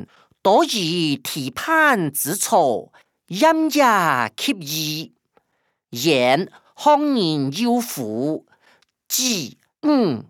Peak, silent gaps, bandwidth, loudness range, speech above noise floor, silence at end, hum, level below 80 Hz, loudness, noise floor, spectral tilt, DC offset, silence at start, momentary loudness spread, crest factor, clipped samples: -4 dBFS; none; 20 kHz; 3 LU; 52 dB; 0.05 s; none; -70 dBFS; -19 LUFS; -71 dBFS; -3.5 dB/octave; under 0.1%; 0 s; 10 LU; 18 dB; under 0.1%